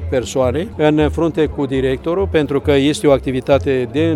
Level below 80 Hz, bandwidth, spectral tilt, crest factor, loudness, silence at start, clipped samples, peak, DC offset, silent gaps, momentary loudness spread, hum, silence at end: -34 dBFS; 13 kHz; -6.5 dB/octave; 16 dB; -16 LUFS; 0 s; under 0.1%; 0 dBFS; under 0.1%; none; 4 LU; none; 0 s